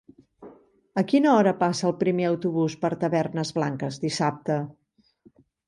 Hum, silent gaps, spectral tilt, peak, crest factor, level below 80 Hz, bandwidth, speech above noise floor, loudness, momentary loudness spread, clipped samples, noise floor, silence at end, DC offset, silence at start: none; none; -6 dB/octave; -8 dBFS; 16 dB; -68 dBFS; 11.5 kHz; 35 dB; -24 LUFS; 9 LU; under 0.1%; -59 dBFS; 0.95 s; under 0.1%; 0.4 s